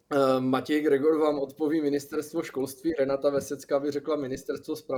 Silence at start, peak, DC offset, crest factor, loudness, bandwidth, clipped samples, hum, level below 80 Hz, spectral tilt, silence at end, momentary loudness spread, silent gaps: 0.1 s; -10 dBFS; under 0.1%; 16 dB; -27 LUFS; 20 kHz; under 0.1%; none; -64 dBFS; -5.5 dB/octave; 0 s; 9 LU; none